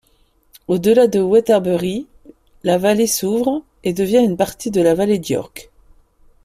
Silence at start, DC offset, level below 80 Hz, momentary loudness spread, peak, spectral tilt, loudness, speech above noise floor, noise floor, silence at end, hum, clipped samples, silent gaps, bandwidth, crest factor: 0.7 s; under 0.1%; -50 dBFS; 11 LU; -2 dBFS; -5 dB/octave; -17 LUFS; 42 dB; -57 dBFS; 0.8 s; none; under 0.1%; none; 16 kHz; 14 dB